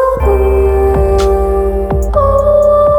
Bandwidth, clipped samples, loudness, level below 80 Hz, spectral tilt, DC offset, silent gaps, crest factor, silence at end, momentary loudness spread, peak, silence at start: 17.5 kHz; under 0.1%; -11 LUFS; -16 dBFS; -8 dB/octave; under 0.1%; none; 10 dB; 0 s; 5 LU; 0 dBFS; 0 s